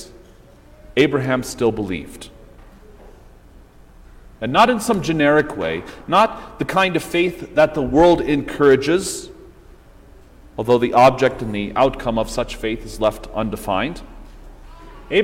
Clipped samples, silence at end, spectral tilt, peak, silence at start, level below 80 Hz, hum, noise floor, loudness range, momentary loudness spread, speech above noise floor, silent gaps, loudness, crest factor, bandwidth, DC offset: under 0.1%; 0 s; -5 dB/octave; -2 dBFS; 0 s; -40 dBFS; none; -46 dBFS; 6 LU; 13 LU; 28 dB; none; -18 LUFS; 16 dB; 16.5 kHz; under 0.1%